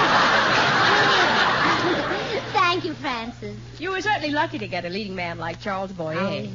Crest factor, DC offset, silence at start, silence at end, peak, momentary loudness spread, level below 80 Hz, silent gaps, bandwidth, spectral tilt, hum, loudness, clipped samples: 16 dB; under 0.1%; 0 s; 0 s; -8 dBFS; 12 LU; -50 dBFS; none; 7.6 kHz; -4 dB/octave; none; -21 LUFS; under 0.1%